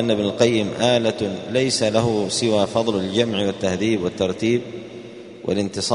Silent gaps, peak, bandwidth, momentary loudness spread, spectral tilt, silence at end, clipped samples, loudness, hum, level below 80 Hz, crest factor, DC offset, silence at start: none; -2 dBFS; 11 kHz; 11 LU; -4.5 dB/octave; 0 s; under 0.1%; -20 LUFS; none; -54 dBFS; 20 dB; under 0.1%; 0 s